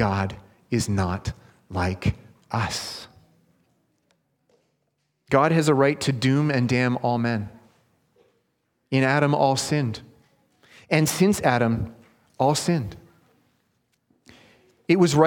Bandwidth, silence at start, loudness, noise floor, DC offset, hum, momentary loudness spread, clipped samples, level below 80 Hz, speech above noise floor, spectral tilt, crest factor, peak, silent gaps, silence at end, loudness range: 18.5 kHz; 0 s; -23 LUFS; -73 dBFS; under 0.1%; none; 16 LU; under 0.1%; -50 dBFS; 52 dB; -5.5 dB/octave; 22 dB; -2 dBFS; none; 0 s; 8 LU